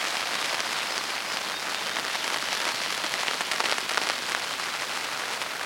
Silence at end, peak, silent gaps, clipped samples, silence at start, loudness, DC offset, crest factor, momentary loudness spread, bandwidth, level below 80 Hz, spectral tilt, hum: 0 s; -4 dBFS; none; under 0.1%; 0 s; -27 LUFS; under 0.1%; 26 dB; 4 LU; 17 kHz; -74 dBFS; 0.5 dB/octave; none